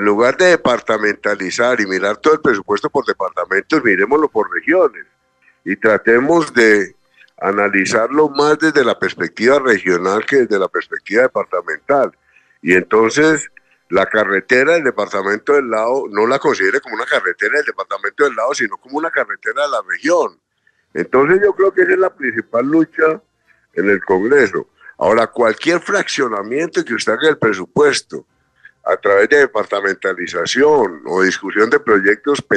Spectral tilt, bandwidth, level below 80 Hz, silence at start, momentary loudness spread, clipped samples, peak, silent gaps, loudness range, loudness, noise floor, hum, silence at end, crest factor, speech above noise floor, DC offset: -4 dB/octave; 10 kHz; -58 dBFS; 0 s; 8 LU; under 0.1%; 0 dBFS; none; 2 LU; -15 LUFS; -61 dBFS; none; 0 s; 16 dB; 46 dB; under 0.1%